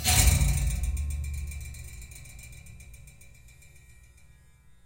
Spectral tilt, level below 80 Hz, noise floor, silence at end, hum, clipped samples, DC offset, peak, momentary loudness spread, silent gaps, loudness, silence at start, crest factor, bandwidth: -3 dB/octave; -34 dBFS; -56 dBFS; 0.95 s; none; under 0.1%; under 0.1%; -6 dBFS; 27 LU; none; -27 LUFS; 0 s; 24 dB; 17 kHz